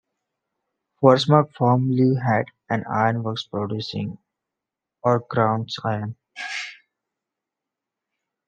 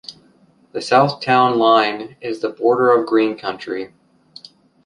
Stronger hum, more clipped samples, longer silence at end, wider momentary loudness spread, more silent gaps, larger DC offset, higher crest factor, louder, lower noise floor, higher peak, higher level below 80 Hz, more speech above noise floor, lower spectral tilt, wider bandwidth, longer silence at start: neither; neither; first, 1.75 s vs 1 s; about the same, 13 LU vs 15 LU; neither; neither; first, 22 dB vs 16 dB; second, -22 LUFS vs -17 LUFS; first, -86 dBFS vs -54 dBFS; about the same, -2 dBFS vs -2 dBFS; about the same, -68 dBFS vs -66 dBFS; first, 65 dB vs 37 dB; first, -7 dB/octave vs -5.5 dB/octave; second, 9 kHz vs 11 kHz; first, 1 s vs 0.1 s